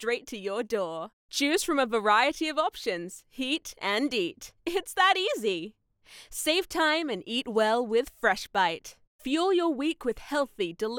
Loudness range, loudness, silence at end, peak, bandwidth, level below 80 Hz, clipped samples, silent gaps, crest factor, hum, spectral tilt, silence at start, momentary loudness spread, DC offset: 1 LU; -28 LUFS; 0 s; -10 dBFS; 19.5 kHz; -60 dBFS; under 0.1%; 1.13-1.29 s, 9.07-9.19 s; 18 dB; none; -2.5 dB/octave; 0 s; 11 LU; under 0.1%